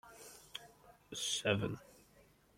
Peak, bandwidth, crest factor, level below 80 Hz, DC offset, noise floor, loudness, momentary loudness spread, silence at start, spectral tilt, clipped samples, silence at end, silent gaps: -18 dBFS; 16.5 kHz; 26 dB; -70 dBFS; under 0.1%; -67 dBFS; -39 LUFS; 20 LU; 0.05 s; -3.5 dB/octave; under 0.1%; 0.65 s; none